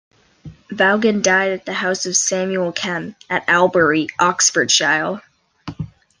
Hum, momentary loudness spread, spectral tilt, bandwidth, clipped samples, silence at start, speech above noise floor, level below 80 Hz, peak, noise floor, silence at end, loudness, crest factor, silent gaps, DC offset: none; 18 LU; -2.5 dB/octave; 10.5 kHz; under 0.1%; 0.45 s; 23 dB; -56 dBFS; 0 dBFS; -41 dBFS; 0.35 s; -16 LUFS; 18 dB; none; under 0.1%